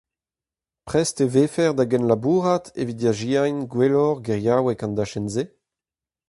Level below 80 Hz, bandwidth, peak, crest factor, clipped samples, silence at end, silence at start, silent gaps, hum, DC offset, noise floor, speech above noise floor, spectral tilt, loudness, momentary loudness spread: -56 dBFS; 11.5 kHz; -4 dBFS; 18 dB; under 0.1%; 0.85 s; 0.85 s; none; none; under 0.1%; under -90 dBFS; over 69 dB; -6 dB/octave; -22 LUFS; 7 LU